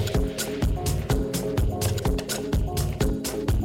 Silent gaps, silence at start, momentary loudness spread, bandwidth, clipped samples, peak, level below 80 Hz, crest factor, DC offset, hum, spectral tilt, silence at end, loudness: none; 0 s; 2 LU; 16.5 kHz; under 0.1%; -10 dBFS; -30 dBFS; 14 dB; under 0.1%; none; -5.5 dB/octave; 0 s; -27 LUFS